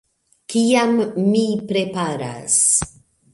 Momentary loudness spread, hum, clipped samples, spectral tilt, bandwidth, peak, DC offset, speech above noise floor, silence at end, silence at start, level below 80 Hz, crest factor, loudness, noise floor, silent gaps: 10 LU; none; under 0.1%; -3.5 dB/octave; 11.5 kHz; -4 dBFS; under 0.1%; 22 dB; 0.45 s; 0.5 s; -52 dBFS; 16 dB; -18 LUFS; -40 dBFS; none